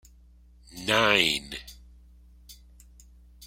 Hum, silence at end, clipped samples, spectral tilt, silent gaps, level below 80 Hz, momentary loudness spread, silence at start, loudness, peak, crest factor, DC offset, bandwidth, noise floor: none; 0 s; under 0.1%; -2.5 dB/octave; none; -52 dBFS; 25 LU; 0.75 s; -23 LUFS; -4 dBFS; 28 dB; under 0.1%; 16.5 kHz; -55 dBFS